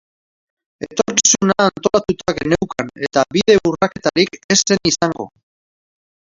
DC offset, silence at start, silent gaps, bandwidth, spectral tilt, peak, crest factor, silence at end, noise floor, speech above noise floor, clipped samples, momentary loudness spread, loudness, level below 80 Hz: under 0.1%; 0.8 s; 4.44-4.49 s; 7.8 kHz; -3 dB/octave; 0 dBFS; 18 dB; 1.05 s; under -90 dBFS; over 74 dB; under 0.1%; 11 LU; -16 LUFS; -48 dBFS